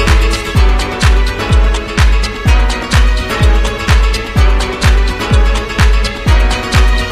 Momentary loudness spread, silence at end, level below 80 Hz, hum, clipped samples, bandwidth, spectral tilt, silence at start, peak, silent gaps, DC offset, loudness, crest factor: 2 LU; 0 s; -10 dBFS; none; under 0.1%; 13.5 kHz; -5 dB/octave; 0 s; 0 dBFS; none; under 0.1%; -12 LUFS; 10 dB